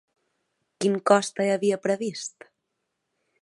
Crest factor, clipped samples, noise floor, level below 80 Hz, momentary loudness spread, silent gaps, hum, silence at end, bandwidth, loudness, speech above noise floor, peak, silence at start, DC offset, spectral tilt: 24 dB; under 0.1%; -80 dBFS; -78 dBFS; 12 LU; none; none; 1.15 s; 11.5 kHz; -24 LUFS; 56 dB; -4 dBFS; 0.8 s; under 0.1%; -4.5 dB/octave